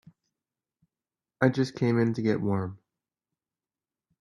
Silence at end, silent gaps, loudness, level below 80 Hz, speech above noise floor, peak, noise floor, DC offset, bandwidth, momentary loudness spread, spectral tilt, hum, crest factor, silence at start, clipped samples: 1.45 s; none; -27 LUFS; -68 dBFS; over 64 dB; -8 dBFS; under -90 dBFS; under 0.1%; 11 kHz; 6 LU; -8 dB/octave; none; 24 dB; 1.4 s; under 0.1%